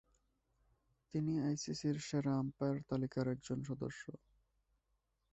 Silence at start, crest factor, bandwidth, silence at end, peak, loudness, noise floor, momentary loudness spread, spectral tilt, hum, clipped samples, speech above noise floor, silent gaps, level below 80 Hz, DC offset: 1.15 s; 16 dB; 8.2 kHz; 1.15 s; -24 dBFS; -40 LUFS; -83 dBFS; 7 LU; -6.5 dB/octave; none; under 0.1%; 44 dB; none; -70 dBFS; under 0.1%